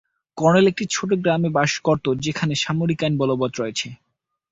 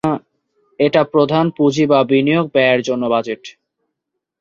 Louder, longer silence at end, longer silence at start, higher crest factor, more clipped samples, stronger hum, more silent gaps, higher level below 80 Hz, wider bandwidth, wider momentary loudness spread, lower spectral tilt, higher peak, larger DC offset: second, -21 LUFS vs -15 LUFS; second, 0.55 s vs 0.9 s; first, 0.35 s vs 0.05 s; about the same, 18 dB vs 14 dB; neither; neither; neither; about the same, -56 dBFS vs -58 dBFS; about the same, 8 kHz vs 7.6 kHz; about the same, 9 LU vs 8 LU; second, -5 dB/octave vs -6.5 dB/octave; about the same, -4 dBFS vs -2 dBFS; neither